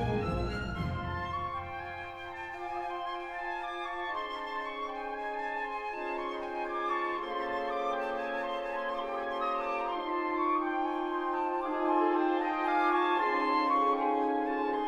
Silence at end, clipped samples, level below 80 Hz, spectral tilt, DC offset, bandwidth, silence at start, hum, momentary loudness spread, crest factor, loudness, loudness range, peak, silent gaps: 0 s; under 0.1%; -52 dBFS; -7 dB/octave; under 0.1%; 9.4 kHz; 0 s; none; 9 LU; 16 dB; -33 LUFS; 8 LU; -16 dBFS; none